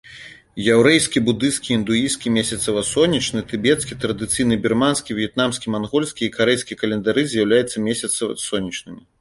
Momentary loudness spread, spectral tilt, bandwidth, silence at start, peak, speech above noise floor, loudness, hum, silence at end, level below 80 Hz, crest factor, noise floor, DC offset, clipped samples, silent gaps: 8 LU; -4 dB/octave; 11.5 kHz; 0.05 s; 0 dBFS; 22 dB; -19 LUFS; none; 0.2 s; -50 dBFS; 18 dB; -42 dBFS; under 0.1%; under 0.1%; none